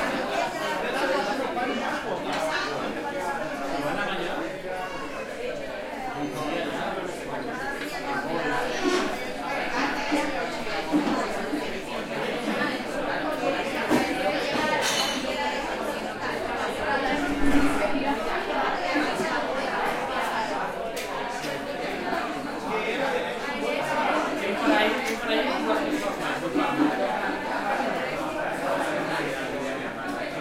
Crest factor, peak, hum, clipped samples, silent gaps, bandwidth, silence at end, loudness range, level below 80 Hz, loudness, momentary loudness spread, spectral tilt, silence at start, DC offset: 20 dB; -8 dBFS; none; under 0.1%; none; 16.5 kHz; 0 s; 5 LU; -48 dBFS; -27 LUFS; 7 LU; -3.5 dB/octave; 0 s; under 0.1%